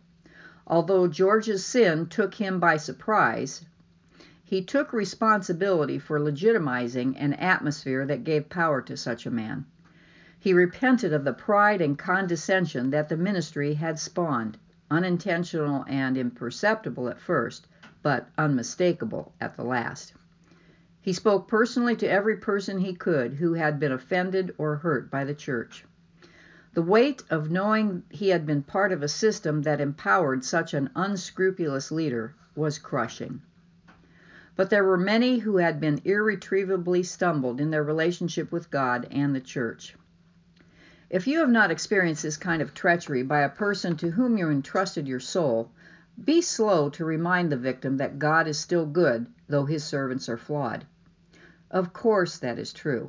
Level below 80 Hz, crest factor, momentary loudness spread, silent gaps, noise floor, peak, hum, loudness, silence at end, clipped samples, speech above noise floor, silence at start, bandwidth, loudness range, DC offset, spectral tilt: -68 dBFS; 18 dB; 9 LU; none; -59 dBFS; -8 dBFS; none; -26 LUFS; 0 s; under 0.1%; 34 dB; 0.45 s; 7.6 kHz; 4 LU; under 0.1%; -5.5 dB/octave